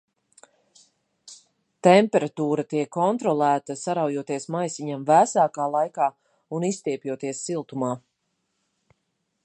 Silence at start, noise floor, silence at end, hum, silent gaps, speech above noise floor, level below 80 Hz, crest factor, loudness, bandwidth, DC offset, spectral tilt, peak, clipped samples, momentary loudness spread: 1.25 s; -76 dBFS; 1.45 s; none; none; 53 dB; -78 dBFS; 22 dB; -24 LUFS; 11 kHz; under 0.1%; -5.5 dB/octave; -2 dBFS; under 0.1%; 12 LU